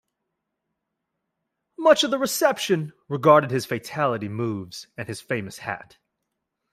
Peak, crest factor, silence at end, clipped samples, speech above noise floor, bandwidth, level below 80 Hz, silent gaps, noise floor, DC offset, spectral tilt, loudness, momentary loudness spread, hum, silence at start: -2 dBFS; 22 dB; 0.95 s; under 0.1%; 58 dB; 16 kHz; -68 dBFS; none; -81 dBFS; under 0.1%; -4.5 dB/octave; -23 LUFS; 17 LU; none; 1.8 s